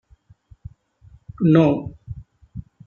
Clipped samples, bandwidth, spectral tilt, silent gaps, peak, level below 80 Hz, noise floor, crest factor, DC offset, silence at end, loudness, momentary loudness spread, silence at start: under 0.1%; 6.8 kHz; -10 dB/octave; none; -2 dBFS; -48 dBFS; -52 dBFS; 20 dB; under 0.1%; 0.25 s; -18 LUFS; 24 LU; 1.4 s